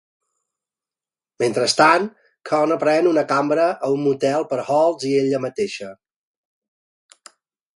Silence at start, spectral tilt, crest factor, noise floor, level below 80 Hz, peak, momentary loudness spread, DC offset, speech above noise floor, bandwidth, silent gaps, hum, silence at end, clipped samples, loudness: 1.4 s; -4.5 dB/octave; 20 dB; under -90 dBFS; -70 dBFS; 0 dBFS; 10 LU; under 0.1%; over 72 dB; 11.5 kHz; none; none; 1.8 s; under 0.1%; -19 LUFS